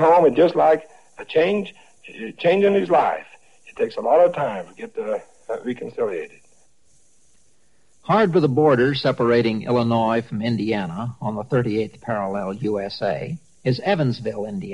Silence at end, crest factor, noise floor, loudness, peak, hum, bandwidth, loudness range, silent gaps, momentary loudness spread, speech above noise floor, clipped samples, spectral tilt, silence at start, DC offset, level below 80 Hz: 0 s; 16 dB; -63 dBFS; -21 LUFS; -4 dBFS; none; 11 kHz; 6 LU; none; 14 LU; 43 dB; under 0.1%; -7.5 dB/octave; 0 s; 0.2%; -58 dBFS